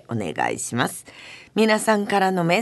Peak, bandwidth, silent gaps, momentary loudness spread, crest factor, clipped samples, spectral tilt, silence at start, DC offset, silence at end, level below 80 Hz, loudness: -4 dBFS; 12.5 kHz; none; 16 LU; 18 dB; under 0.1%; -4.5 dB/octave; 0.1 s; under 0.1%; 0 s; -62 dBFS; -22 LUFS